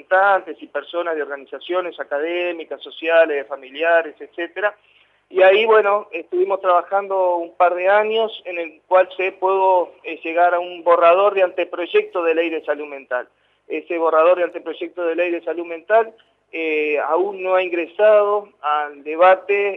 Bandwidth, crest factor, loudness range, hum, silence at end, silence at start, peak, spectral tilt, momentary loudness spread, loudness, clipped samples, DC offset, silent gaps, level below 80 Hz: 4.1 kHz; 16 dB; 4 LU; none; 0 s; 0.1 s; -2 dBFS; -5.5 dB/octave; 14 LU; -18 LUFS; under 0.1%; under 0.1%; none; -80 dBFS